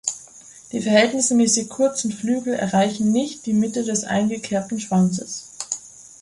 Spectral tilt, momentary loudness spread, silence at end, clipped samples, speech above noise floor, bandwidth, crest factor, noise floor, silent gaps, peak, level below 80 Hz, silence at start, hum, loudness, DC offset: -4 dB/octave; 13 LU; 0.15 s; under 0.1%; 25 dB; 11.5 kHz; 18 dB; -45 dBFS; none; -2 dBFS; -60 dBFS; 0.05 s; none; -21 LUFS; under 0.1%